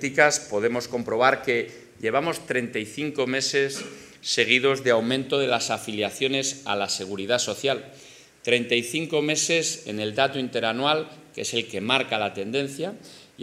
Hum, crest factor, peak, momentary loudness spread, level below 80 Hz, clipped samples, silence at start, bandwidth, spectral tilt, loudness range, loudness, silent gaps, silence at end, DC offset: none; 22 dB; -2 dBFS; 11 LU; -70 dBFS; under 0.1%; 0 s; 15.5 kHz; -3 dB/octave; 2 LU; -24 LUFS; none; 0 s; under 0.1%